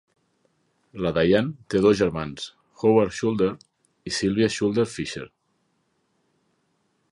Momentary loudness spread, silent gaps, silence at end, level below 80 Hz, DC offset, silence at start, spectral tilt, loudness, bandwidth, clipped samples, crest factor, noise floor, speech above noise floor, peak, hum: 17 LU; none; 1.85 s; -52 dBFS; under 0.1%; 0.95 s; -5.5 dB/octave; -23 LUFS; 11.5 kHz; under 0.1%; 20 dB; -71 dBFS; 48 dB; -6 dBFS; none